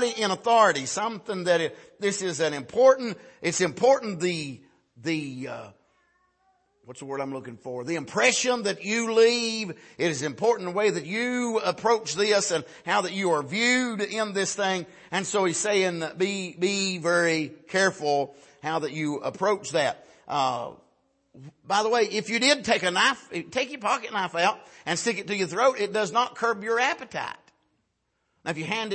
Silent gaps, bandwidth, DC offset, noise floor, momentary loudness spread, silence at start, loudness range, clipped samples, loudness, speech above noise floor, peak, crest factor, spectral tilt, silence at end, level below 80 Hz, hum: none; 8.8 kHz; under 0.1%; -75 dBFS; 12 LU; 0 s; 4 LU; under 0.1%; -25 LUFS; 50 dB; -6 dBFS; 20 dB; -3 dB/octave; 0 s; -72 dBFS; none